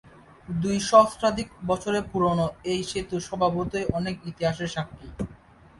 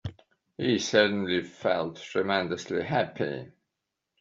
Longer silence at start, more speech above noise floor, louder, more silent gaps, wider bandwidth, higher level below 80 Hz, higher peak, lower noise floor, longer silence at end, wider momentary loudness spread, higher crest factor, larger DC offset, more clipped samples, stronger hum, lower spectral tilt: about the same, 0.05 s vs 0.05 s; second, 26 dB vs 57 dB; first, -25 LUFS vs -28 LUFS; neither; first, 11.5 kHz vs 7.8 kHz; first, -48 dBFS vs -64 dBFS; first, -4 dBFS vs -8 dBFS; second, -51 dBFS vs -85 dBFS; second, 0.45 s vs 0.7 s; first, 15 LU vs 10 LU; about the same, 22 dB vs 22 dB; neither; neither; neither; first, -5.5 dB/octave vs -3.5 dB/octave